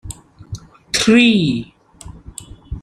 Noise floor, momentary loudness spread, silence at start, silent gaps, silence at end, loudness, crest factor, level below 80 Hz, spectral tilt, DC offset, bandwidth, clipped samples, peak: -39 dBFS; 24 LU; 0.05 s; none; 0.05 s; -14 LUFS; 16 dB; -40 dBFS; -4 dB/octave; under 0.1%; 13.5 kHz; under 0.1%; -2 dBFS